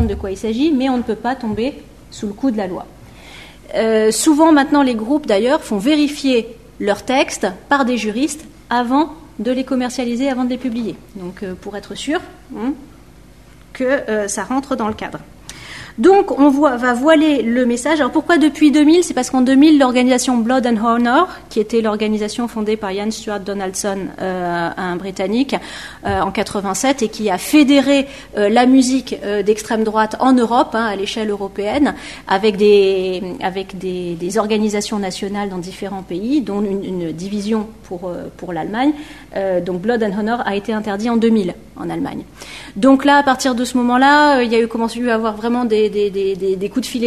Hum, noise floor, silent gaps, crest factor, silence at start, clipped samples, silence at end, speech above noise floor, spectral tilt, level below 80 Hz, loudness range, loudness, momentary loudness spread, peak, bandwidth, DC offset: none; -43 dBFS; none; 16 dB; 0 s; under 0.1%; 0 s; 27 dB; -4.5 dB/octave; -44 dBFS; 9 LU; -16 LUFS; 15 LU; -2 dBFS; 13.5 kHz; under 0.1%